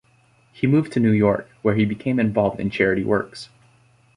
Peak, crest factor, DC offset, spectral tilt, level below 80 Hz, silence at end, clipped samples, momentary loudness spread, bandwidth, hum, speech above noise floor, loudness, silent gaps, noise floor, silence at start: -4 dBFS; 18 dB; under 0.1%; -8 dB/octave; -50 dBFS; 0.7 s; under 0.1%; 7 LU; 10.5 kHz; none; 38 dB; -21 LUFS; none; -58 dBFS; 0.6 s